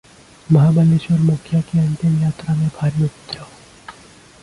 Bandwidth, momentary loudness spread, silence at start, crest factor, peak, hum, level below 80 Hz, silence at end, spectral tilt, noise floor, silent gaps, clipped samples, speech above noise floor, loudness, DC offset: 11 kHz; 9 LU; 0.5 s; 16 dB; -2 dBFS; none; -48 dBFS; 0.5 s; -8.5 dB/octave; -44 dBFS; none; under 0.1%; 29 dB; -17 LUFS; under 0.1%